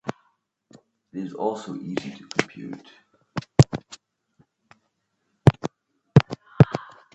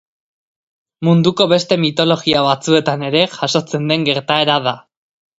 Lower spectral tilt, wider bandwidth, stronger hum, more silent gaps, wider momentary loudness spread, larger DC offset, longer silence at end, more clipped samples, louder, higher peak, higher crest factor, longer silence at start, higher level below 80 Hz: first, -7 dB/octave vs -5 dB/octave; about the same, 8.4 kHz vs 8 kHz; neither; neither; first, 16 LU vs 5 LU; neither; second, 0.35 s vs 0.6 s; neither; second, -23 LUFS vs -15 LUFS; about the same, 0 dBFS vs 0 dBFS; first, 24 dB vs 16 dB; second, 0.05 s vs 1 s; first, -48 dBFS vs -56 dBFS